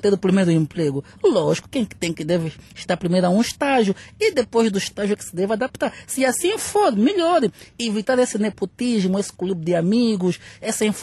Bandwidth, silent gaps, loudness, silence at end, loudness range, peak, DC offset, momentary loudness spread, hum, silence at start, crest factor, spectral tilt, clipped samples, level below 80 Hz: 13 kHz; none; -21 LUFS; 0 s; 1 LU; -6 dBFS; under 0.1%; 7 LU; none; 0.05 s; 14 dB; -5 dB/octave; under 0.1%; -56 dBFS